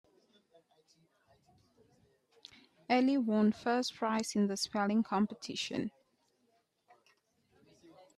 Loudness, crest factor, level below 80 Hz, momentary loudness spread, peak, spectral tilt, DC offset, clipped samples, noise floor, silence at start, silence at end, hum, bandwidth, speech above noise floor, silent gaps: -33 LUFS; 18 dB; -78 dBFS; 10 LU; -18 dBFS; -5 dB/octave; under 0.1%; under 0.1%; -76 dBFS; 2.9 s; 2.3 s; none; 13 kHz; 44 dB; none